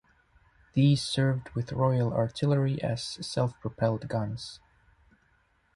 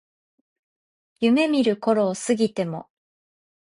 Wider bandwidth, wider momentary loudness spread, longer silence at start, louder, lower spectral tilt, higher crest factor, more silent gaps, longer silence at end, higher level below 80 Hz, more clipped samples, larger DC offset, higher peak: about the same, 11 kHz vs 11 kHz; about the same, 9 LU vs 10 LU; second, 0.75 s vs 1.2 s; second, -29 LUFS vs -22 LUFS; first, -6.5 dB/octave vs -5 dB/octave; about the same, 18 dB vs 16 dB; neither; first, 1.2 s vs 0.8 s; first, -56 dBFS vs -68 dBFS; neither; neither; second, -12 dBFS vs -8 dBFS